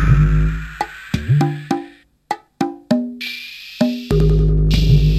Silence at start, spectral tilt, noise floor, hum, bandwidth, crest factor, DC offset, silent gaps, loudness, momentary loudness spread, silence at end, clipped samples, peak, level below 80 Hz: 0 s; -7.5 dB/octave; -39 dBFS; none; 14 kHz; 14 dB; under 0.1%; none; -19 LUFS; 14 LU; 0 s; under 0.1%; -2 dBFS; -20 dBFS